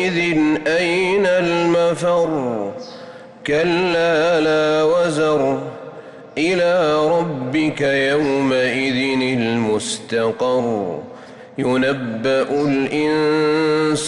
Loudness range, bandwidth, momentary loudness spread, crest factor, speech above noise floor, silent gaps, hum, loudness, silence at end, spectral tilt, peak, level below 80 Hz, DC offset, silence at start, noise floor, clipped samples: 3 LU; 11.5 kHz; 13 LU; 10 dB; 21 dB; none; none; -18 LUFS; 0 s; -5 dB/octave; -8 dBFS; -54 dBFS; under 0.1%; 0 s; -38 dBFS; under 0.1%